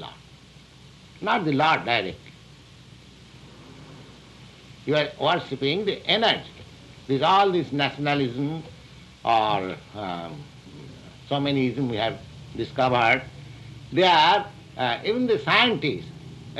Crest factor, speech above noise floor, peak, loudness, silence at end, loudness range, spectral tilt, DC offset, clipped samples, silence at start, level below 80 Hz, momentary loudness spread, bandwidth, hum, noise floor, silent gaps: 20 dB; 26 dB; -6 dBFS; -23 LUFS; 0 s; 7 LU; -5.5 dB/octave; under 0.1%; under 0.1%; 0 s; -56 dBFS; 24 LU; 12 kHz; none; -49 dBFS; none